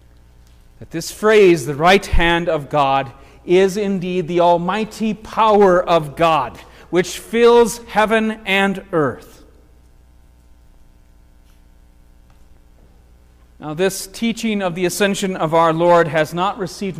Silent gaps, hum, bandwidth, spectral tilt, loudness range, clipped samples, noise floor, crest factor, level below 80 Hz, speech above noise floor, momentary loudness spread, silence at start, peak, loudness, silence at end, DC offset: none; 60 Hz at -45 dBFS; 16 kHz; -5 dB/octave; 10 LU; under 0.1%; -48 dBFS; 16 dB; -34 dBFS; 32 dB; 10 LU; 0.8 s; -2 dBFS; -16 LUFS; 0 s; under 0.1%